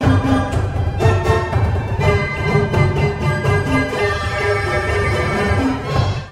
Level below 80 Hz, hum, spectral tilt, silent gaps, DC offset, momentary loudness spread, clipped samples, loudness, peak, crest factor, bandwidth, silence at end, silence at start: -28 dBFS; none; -6.5 dB/octave; none; under 0.1%; 3 LU; under 0.1%; -17 LUFS; -2 dBFS; 16 dB; 12 kHz; 0 s; 0 s